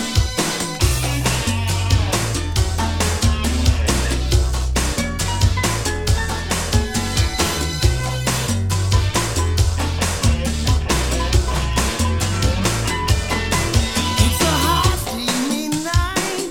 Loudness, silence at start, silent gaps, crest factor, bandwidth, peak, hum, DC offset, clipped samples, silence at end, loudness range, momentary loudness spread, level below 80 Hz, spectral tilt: -19 LUFS; 0 s; none; 16 dB; 18.5 kHz; -2 dBFS; none; under 0.1%; under 0.1%; 0 s; 1 LU; 3 LU; -24 dBFS; -4 dB/octave